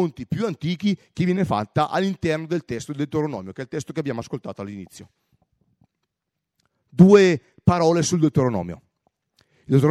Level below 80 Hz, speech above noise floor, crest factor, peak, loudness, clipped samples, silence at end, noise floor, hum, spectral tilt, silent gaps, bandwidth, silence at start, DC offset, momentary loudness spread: -54 dBFS; 61 dB; 20 dB; -2 dBFS; -21 LUFS; under 0.1%; 0 s; -82 dBFS; none; -6.5 dB/octave; none; 12.5 kHz; 0 s; under 0.1%; 18 LU